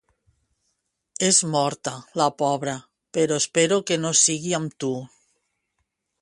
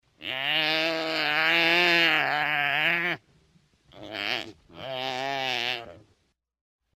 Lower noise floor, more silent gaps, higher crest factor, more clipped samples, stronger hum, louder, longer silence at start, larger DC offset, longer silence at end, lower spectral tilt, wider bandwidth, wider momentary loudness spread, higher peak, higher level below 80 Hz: first, -76 dBFS vs -71 dBFS; neither; about the same, 20 dB vs 20 dB; neither; neither; about the same, -22 LUFS vs -24 LUFS; first, 1.2 s vs 0.2 s; neither; first, 1.15 s vs 1 s; about the same, -3 dB/octave vs -3 dB/octave; second, 11.5 kHz vs 16 kHz; about the same, 13 LU vs 15 LU; about the same, -6 dBFS vs -8 dBFS; about the same, -68 dBFS vs -68 dBFS